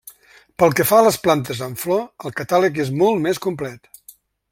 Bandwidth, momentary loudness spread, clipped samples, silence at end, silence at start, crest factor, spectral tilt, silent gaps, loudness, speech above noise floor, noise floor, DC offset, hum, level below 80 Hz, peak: 16.5 kHz; 15 LU; under 0.1%; 0.75 s; 0.05 s; 18 dB; -5 dB/octave; none; -18 LUFS; 32 dB; -50 dBFS; under 0.1%; none; -56 dBFS; -2 dBFS